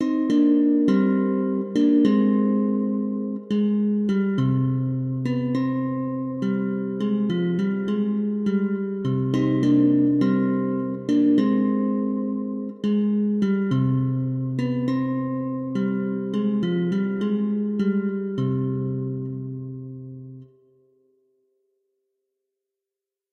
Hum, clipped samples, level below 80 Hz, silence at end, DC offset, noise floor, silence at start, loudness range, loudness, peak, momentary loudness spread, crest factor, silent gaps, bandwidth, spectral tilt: none; under 0.1%; -64 dBFS; 2.9 s; under 0.1%; -88 dBFS; 0 s; 7 LU; -23 LUFS; -6 dBFS; 9 LU; 16 dB; none; 6.6 kHz; -9.5 dB/octave